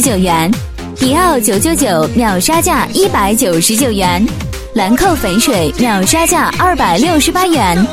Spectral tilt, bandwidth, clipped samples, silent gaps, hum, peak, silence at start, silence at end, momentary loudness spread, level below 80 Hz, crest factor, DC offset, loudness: -4 dB/octave; 16.5 kHz; under 0.1%; none; none; 0 dBFS; 0 s; 0 s; 5 LU; -28 dBFS; 12 dB; under 0.1%; -11 LUFS